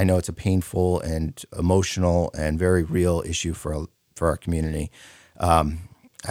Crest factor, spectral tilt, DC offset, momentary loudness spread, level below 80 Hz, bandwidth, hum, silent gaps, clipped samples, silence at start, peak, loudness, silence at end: 22 dB; -6 dB/octave; under 0.1%; 10 LU; -36 dBFS; 16 kHz; none; none; under 0.1%; 0 s; -2 dBFS; -24 LUFS; 0 s